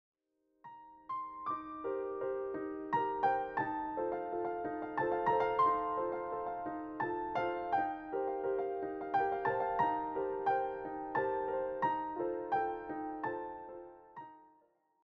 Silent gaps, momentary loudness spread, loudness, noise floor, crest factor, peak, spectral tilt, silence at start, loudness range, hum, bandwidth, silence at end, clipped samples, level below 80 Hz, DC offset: none; 11 LU; -36 LUFS; -79 dBFS; 18 dB; -20 dBFS; -4.5 dB/octave; 0.65 s; 4 LU; none; 6.2 kHz; 0.6 s; under 0.1%; -68 dBFS; under 0.1%